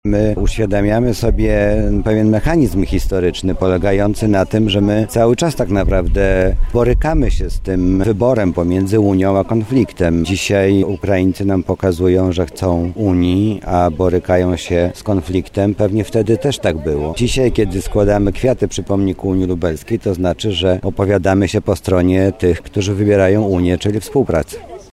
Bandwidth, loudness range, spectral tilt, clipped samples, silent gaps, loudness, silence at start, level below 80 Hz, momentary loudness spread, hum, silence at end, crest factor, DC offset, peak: 15 kHz; 2 LU; -6.5 dB/octave; under 0.1%; none; -15 LUFS; 0.05 s; -24 dBFS; 4 LU; none; 0.1 s; 12 dB; under 0.1%; -2 dBFS